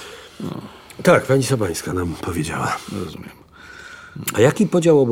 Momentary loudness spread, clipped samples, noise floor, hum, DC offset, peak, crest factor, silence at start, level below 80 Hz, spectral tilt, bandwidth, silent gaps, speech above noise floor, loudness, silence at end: 23 LU; under 0.1%; -40 dBFS; none; under 0.1%; -2 dBFS; 18 dB; 0 s; -48 dBFS; -5.5 dB/octave; 16.5 kHz; none; 22 dB; -19 LUFS; 0 s